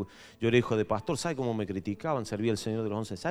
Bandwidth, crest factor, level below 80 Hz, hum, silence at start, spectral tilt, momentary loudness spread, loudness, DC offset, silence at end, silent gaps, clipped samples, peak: 14.5 kHz; 20 dB; -60 dBFS; none; 0 s; -6 dB/octave; 7 LU; -31 LUFS; under 0.1%; 0 s; none; under 0.1%; -10 dBFS